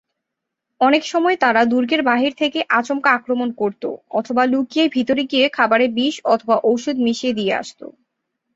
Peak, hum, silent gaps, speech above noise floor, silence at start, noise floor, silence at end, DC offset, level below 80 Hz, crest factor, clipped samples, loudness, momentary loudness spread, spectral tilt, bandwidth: -2 dBFS; none; none; 63 dB; 0.8 s; -81 dBFS; 0.65 s; under 0.1%; -64 dBFS; 16 dB; under 0.1%; -18 LUFS; 7 LU; -4 dB/octave; 8 kHz